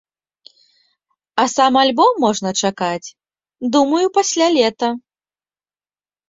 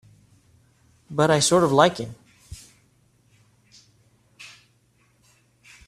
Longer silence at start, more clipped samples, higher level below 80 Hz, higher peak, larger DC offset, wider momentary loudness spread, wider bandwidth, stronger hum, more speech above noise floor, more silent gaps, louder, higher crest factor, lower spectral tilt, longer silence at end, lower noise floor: first, 1.35 s vs 1.1 s; neither; second, -64 dBFS vs -58 dBFS; about the same, 0 dBFS vs -2 dBFS; neither; second, 12 LU vs 27 LU; second, 8 kHz vs 14.5 kHz; first, 50 Hz at -75 dBFS vs none; first, over 74 dB vs 44 dB; neither; first, -16 LUFS vs -20 LUFS; second, 18 dB vs 24 dB; about the same, -3 dB/octave vs -4 dB/octave; about the same, 1.3 s vs 1.4 s; first, under -90 dBFS vs -63 dBFS